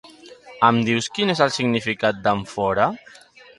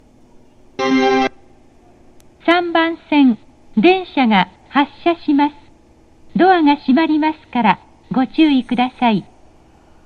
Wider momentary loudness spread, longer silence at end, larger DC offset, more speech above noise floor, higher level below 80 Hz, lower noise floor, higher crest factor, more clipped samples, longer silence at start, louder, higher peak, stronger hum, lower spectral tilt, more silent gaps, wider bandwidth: second, 5 LU vs 9 LU; second, 0.6 s vs 0.85 s; neither; second, 24 dB vs 34 dB; second, -56 dBFS vs -50 dBFS; second, -44 dBFS vs -48 dBFS; first, 22 dB vs 16 dB; neither; second, 0.05 s vs 0.8 s; second, -20 LUFS vs -16 LUFS; about the same, 0 dBFS vs 0 dBFS; neither; about the same, -5 dB/octave vs -6 dB/octave; neither; first, 11.5 kHz vs 6.8 kHz